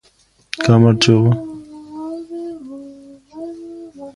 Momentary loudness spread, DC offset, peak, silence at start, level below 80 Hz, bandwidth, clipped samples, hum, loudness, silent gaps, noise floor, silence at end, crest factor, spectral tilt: 23 LU; under 0.1%; 0 dBFS; 0.55 s; -50 dBFS; 11.5 kHz; under 0.1%; none; -14 LUFS; none; -56 dBFS; 0.05 s; 18 dB; -6 dB/octave